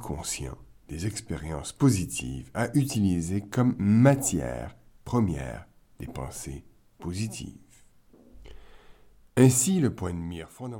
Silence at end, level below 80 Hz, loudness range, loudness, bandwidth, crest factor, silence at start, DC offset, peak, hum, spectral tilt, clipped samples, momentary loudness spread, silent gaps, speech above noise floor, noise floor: 0 s; -48 dBFS; 14 LU; -27 LUFS; 17.5 kHz; 22 dB; 0 s; under 0.1%; -6 dBFS; none; -5.5 dB/octave; under 0.1%; 20 LU; none; 30 dB; -56 dBFS